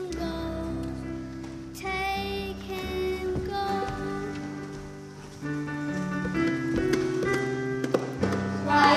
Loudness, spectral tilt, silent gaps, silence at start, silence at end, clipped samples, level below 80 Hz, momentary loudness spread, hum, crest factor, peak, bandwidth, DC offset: -30 LUFS; -5.5 dB/octave; none; 0 s; 0 s; under 0.1%; -46 dBFS; 12 LU; none; 22 dB; -8 dBFS; 15 kHz; under 0.1%